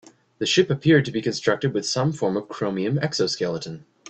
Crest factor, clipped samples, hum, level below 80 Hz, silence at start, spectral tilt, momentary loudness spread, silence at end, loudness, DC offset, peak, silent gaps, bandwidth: 18 dB; under 0.1%; none; -60 dBFS; 0.4 s; -5 dB/octave; 9 LU; 0 s; -23 LUFS; under 0.1%; -4 dBFS; none; 8.8 kHz